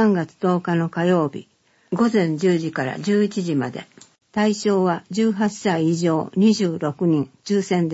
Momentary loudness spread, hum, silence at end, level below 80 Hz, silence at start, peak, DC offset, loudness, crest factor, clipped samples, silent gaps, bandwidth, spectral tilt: 6 LU; none; 0 s; -66 dBFS; 0 s; -6 dBFS; under 0.1%; -21 LUFS; 14 dB; under 0.1%; none; 8 kHz; -6.5 dB/octave